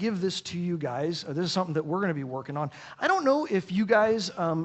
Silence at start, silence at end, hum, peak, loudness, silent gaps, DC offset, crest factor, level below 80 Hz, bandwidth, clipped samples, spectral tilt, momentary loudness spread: 0 s; 0 s; none; -10 dBFS; -28 LUFS; none; under 0.1%; 18 dB; -68 dBFS; 8.4 kHz; under 0.1%; -5.5 dB/octave; 10 LU